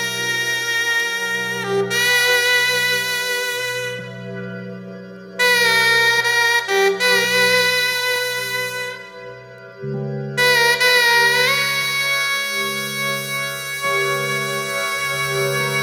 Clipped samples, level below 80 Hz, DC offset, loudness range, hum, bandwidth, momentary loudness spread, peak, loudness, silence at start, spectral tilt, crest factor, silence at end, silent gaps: under 0.1%; -62 dBFS; under 0.1%; 5 LU; none; 19 kHz; 17 LU; -4 dBFS; -17 LUFS; 0 s; -1.5 dB/octave; 16 dB; 0 s; none